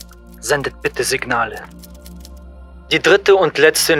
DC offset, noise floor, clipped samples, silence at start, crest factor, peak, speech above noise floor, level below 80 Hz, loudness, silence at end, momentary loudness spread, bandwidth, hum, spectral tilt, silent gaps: under 0.1%; -37 dBFS; under 0.1%; 0.3 s; 18 dB; 0 dBFS; 22 dB; -40 dBFS; -15 LUFS; 0 s; 19 LU; 18 kHz; none; -3 dB/octave; none